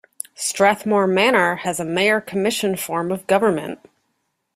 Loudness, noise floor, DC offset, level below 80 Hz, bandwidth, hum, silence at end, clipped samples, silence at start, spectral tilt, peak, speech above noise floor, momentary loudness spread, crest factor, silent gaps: -19 LUFS; -72 dBFS; under 0.1%; -62 dBFS; 16 kHz; none; 0.8 s; under 0.1%; 0.4 s; -3.5 dB/octave; -2 dBFS; 53 dB; 10 LU; 18 dB; none